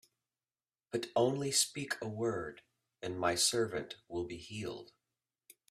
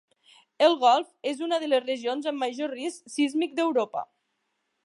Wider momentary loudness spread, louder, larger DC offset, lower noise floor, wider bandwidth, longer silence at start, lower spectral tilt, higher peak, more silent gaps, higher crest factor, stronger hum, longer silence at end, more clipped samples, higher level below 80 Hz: about the same, 13 LU vs 11 LU; second, -35 LUFS vs -26 LUFS; neither; first, under -90 dBFS vs -77 dBFS; first, 15.5 kHz vs 11.5 kHz; first, 0.95 s vs 0.6 s; about the same, -3 dB/octave vs -2.5 dB/octave; second, -16 dBFS vs -6 dBFS; neither; about the same, 22 dB vs 20 dB; neither; about the same, 0.85 s vs 0.8 s; neither; first, -70 dBFS vs -86 dBFS